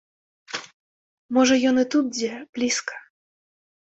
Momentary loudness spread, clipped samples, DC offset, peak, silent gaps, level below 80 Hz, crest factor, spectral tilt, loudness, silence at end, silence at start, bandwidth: 16 LU; under 0.1%; under 0.1%; -6 dBFS; 0.73-1.29 s, 2.49-2.53 s; -68 dBFS; 18 dB; -2 dB/octave; -22 LUFS; 0.95 s; 0.5 s; 8.2 kHz